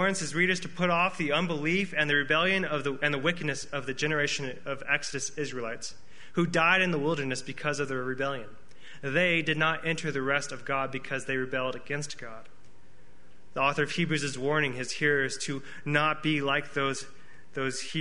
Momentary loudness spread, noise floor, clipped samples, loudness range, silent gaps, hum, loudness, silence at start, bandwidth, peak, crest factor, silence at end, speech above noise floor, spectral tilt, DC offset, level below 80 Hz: 11 LU; -59 dBFS; under 0.1%; 5 LU; none; none; -28 LUFS; 0 s; 10.5 kHz; -8 dBFS; 22 dB; 0 s; 30 dB; -4 dB/octave; 1%; -62 dBFS